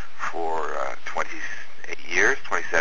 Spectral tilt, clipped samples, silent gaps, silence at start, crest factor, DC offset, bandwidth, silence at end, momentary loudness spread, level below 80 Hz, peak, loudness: -2.5 dB/octave; under 0.1%; none; 0 s; 22 dB; 8%; 7.8 kHz; 0 s; 15 LU; -58 dBFS; -4 dBFS; -26 LUFS